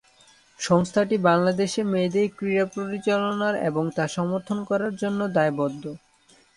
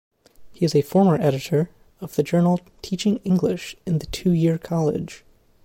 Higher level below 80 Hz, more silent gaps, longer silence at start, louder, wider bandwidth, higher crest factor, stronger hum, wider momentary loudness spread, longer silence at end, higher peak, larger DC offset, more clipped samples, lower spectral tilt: second, -64 dBFS vs -50 dBFS; neither; first, 0.6 s vs 0.4 s; about the same, -24 LUFS vs -22 LUFS; second, 11.5 kHz vs 16.5 kHz; first, 20 dB vs 14 dB; neither; second, 7 LU vs 12 LU; first, 0.6 s vs 0.45 s; about the same, -6 dBFS vs -8 dBFS; neither; neither; about the same, -6 dB/octave vs -7 dB/octave